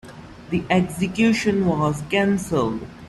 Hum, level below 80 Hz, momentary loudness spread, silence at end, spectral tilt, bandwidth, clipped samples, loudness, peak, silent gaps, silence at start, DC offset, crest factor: none; -48 dBFS; 9 LU; 0 s; -6 dB/octave; 13 kHz; under 0.1%; -21 LUFS; -6 dBFS; none; 0.05 s; under 0.1%; 16 dB